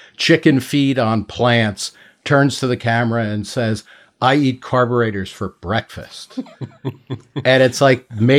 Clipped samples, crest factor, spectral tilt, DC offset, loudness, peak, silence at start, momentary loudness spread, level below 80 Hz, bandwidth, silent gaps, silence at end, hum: under 0.1%; 16 dB; -5.5 dB/octave; under 0.1%; -17 LUFS; 0 dBFS; 0.2 s; 17 LU; -56 dBFS; 15.5 kHz; none; 0 s; none